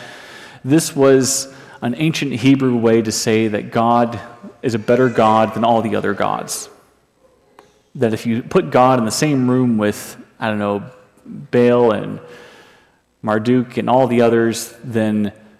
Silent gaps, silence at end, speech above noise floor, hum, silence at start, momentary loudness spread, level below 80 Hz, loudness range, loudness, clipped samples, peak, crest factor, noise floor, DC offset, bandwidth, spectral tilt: none; 0.3 s; 39 dB; none; 0 s; 16 LU; -58 dBFS; 4 LU; -16 LUFS; under 0.1%; -2 dBFS; 14 dB; -55 dBFS; under 0.1%; 15 kHz; -5.5 dB/octave